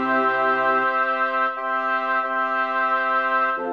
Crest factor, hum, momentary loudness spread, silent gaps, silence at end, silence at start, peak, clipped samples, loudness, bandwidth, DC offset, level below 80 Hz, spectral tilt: 12 dB; none; 3 LU; none; 0 s; 0 s; -10 dBFS; under 0.1%; -21 LUFS; 6.6 kHz; 0.1%; -72 dBFS; -5 dB/octave